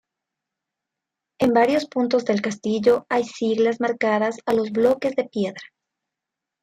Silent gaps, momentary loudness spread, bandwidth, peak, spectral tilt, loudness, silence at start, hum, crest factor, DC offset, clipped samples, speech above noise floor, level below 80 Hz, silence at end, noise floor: none; 6 LU; 13 kHz; -4 dBFS; -5.5 dB/octave; -21 LUFS; 1.4 s; none; 18 dB; under 0.1%; under 0.1%; 65 dB; -64 dBFS; 0.95 s; -85 dBFS